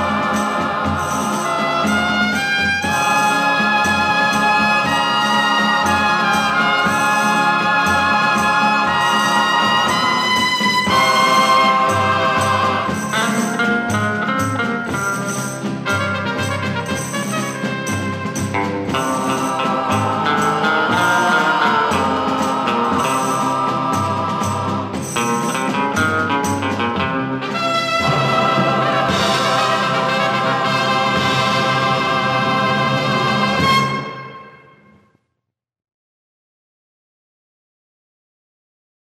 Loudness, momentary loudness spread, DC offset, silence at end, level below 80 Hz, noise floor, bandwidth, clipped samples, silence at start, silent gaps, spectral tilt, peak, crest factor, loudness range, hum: -16 LUFS; 6 LU; under 0.1%; 4.5 s; -50 dBFS; -78 dBFS; 15.5 kHz; under 0.1%; 0 s; none; -4 dB/octave; -2 dBFS; 16 dB; 6 LU; none